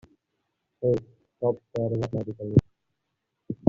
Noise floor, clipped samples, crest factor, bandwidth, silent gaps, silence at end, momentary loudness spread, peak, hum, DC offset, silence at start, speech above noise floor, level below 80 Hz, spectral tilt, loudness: -80 dBFS; under 0.1%; 24 dB; 7.4 kHz; none; 0 s; 7 LU; -4 dBFS; none; under 0.1%; 0.8 s; 55 dB; -52 dBFS; -10.5 dB/octave; -28 LUFS